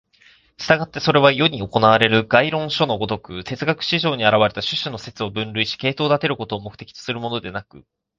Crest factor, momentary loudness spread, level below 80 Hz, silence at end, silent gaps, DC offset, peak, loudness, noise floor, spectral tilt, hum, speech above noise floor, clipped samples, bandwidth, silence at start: 20 dB; 14 LU; -52 dBFS; 0.4 s; none; under 0.1%; 0 dBFS; -19 LUFS; -54 dBFS; -5.5 dB/octave; none; 34 dB; under 0.1%; 7.6 kHz; 0.6 s